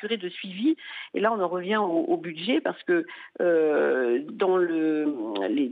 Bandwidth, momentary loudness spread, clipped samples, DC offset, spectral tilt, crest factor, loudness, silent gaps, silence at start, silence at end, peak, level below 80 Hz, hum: 4.8 kHz; 7 LU; under 0.1%; under 0.1%; -8 dB/octave; 14 dB; -26 LUFS; none; 0 s; 0 s; -10 dBFS; -88 dBFS; none